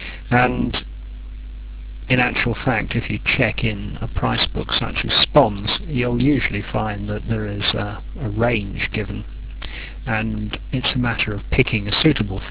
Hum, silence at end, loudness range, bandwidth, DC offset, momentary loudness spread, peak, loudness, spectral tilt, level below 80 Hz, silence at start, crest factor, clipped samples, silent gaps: none; 0 s; 5 LU; 4 kHz; 0.2%; 15 LU; 0 dBFS; -20 LUFS; -9.5 dB/octave; -32 dBFS; 0 s; 20 dB; under 0.1%; none